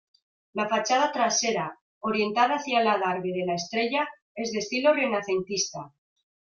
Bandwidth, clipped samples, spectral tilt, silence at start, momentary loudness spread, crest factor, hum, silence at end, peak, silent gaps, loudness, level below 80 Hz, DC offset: 7.4 kHz; under 0.1%; -3 dB/octave; 0.55 s; 9 LU; 18 dB; none; 0.65 s; -8 dBFS; 1.81-2.01 s, 4.22-4.35 s; -26 LUFS; -72 dBFS; under 0.1%